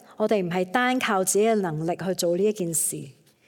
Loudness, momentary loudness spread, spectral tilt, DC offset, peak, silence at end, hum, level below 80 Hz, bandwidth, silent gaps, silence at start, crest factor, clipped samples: -24 LUFS; 6 LU; -4 dB/octave; under 0.1%; -6 dBFS; 0.35 s; none; -68 dBFS; 17.5 kHz; none; 0.1 s; 18 dB; under 0.1%